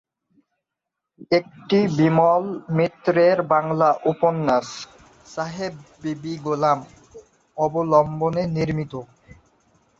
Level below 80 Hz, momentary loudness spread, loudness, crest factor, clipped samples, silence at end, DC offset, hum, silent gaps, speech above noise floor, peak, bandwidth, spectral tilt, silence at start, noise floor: -56 dBFS; 15 LU; -21 LUFS; 18 dB; under 0.1%; 0.95 s; under 0.1%; none; none; 63 dB; -4 dBFS; 7.8 kHz; -7 dB/octave; 1.2 s; -83 dBFS